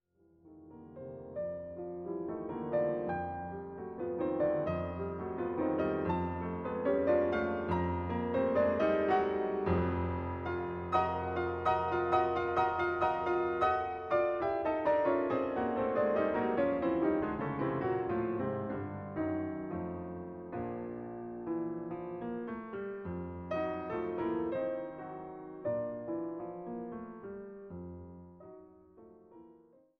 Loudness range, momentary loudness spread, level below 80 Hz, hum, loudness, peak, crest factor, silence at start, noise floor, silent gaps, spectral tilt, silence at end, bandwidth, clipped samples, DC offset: 9 LU; 14 LU; -58 dBFS; none; -34 LUFS; -16 dBFS; 18 dB; 0.45 s; -63 dBFS; none; -9 dB/octave; 0.45 s; 7 kHz; under 0.1%; under 0.1%